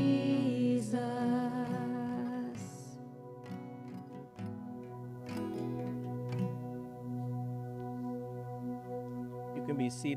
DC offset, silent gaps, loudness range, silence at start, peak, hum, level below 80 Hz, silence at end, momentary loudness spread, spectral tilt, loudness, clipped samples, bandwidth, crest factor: under 0.1%; none; 8 LU; 0 s; -20 dBFS; 60 Hz at -65 dBFS; -72 dBFS; 0 s; 14 LU; -7 dB/octave; -38 LUFS; under 0.1%; 13.5 kHz; 18 dB